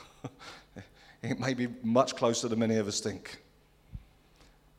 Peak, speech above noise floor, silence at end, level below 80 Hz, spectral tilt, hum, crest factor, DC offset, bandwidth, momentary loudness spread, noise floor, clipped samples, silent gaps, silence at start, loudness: -10 dBFS; 31 dB; 0.8 s; -60 dBFS; -4.5 dB/octave; none; 24 dB; under 0.1%; 14 kHz; 23 LU; -61 dBFS; under 0.1%; none; 0 s; -30 LUFS